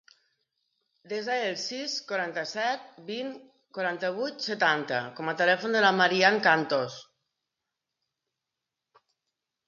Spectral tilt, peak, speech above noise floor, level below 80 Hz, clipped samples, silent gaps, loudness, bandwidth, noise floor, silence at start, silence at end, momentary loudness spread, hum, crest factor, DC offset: -3.5 dB/octave; -8 dBFS; 59 dB; -82 dBFS; under 0.1%; none; -27 LUFS; 7.6 kHz; -87 dBFS; 1.1 s; 2.65 s; 15 LU; none; 22 dB; under 0.1%